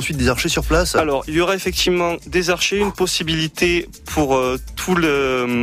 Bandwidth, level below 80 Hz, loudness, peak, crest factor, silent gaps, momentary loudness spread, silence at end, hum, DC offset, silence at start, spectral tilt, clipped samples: 16 kHz; -32 dBFS; -18 LUFS; -4 dBFS; 14 dB; none; 4 LU; 0 s; none; under 0.1%; 0 s; -4 dB/octave; under 0.1%